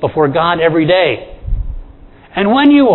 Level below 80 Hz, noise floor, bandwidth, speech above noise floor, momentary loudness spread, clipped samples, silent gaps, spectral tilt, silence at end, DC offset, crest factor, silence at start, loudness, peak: -26 dBFS; -38 dBFS; 4.2 kHz; 27 dB; 16 LU; under 0.1%; none; -9.5 dB/octave; 0 s; under 0.1%; 12 dB; 0 s; -12 LUFS; 0 dBFS